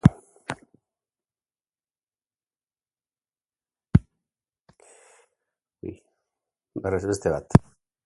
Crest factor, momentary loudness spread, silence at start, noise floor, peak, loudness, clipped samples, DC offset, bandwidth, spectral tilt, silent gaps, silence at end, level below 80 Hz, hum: 28 dB; 19 LU; 0.05 s; under -90 dBFS; 0 dBFS; -25 LUFS; under 0.1%; under 0.1%; 11.5 kHz; -8 dB/octave; none; 0.45 s; -42 dBFS; none